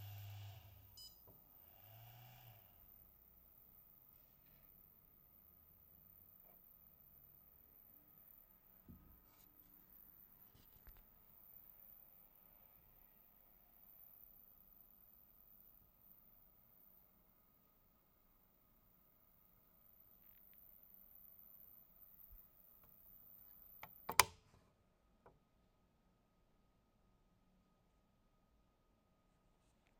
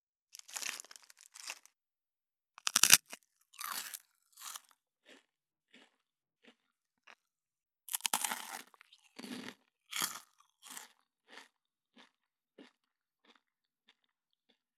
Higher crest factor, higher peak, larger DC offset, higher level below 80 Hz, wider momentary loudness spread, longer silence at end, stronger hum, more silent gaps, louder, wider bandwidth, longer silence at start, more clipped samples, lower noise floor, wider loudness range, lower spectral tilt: first, 48 dB vs 40 dB; second, -6 dBFS vs -2 dBFS; neither; first, -76 dBFS vs under -90 dBFS; second, 8 LU vs 29 LU; second, 0 s vs 2.15 s; neither; neither; second, -48 LUFS vs -33 LUFS; second, 16.5 kHz vs 19 kHz; second, 0 s vs 0.5 s; neither; second, -78 dBFS vs under -90 dBFS; about the same, 22 LU vs 23 LU; first, -1 dB/octave vs 1.5 dB/octave